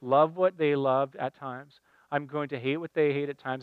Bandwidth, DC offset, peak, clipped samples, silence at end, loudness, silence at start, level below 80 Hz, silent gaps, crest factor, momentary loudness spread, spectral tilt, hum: 4.8 kHz; under 0.1%; -10 dBFS; under 0.1%; 0 s; -28 LUFS; 0 s; -82 dBFS; none; 18 dB; 11 LU; -8.5 dB/octave; none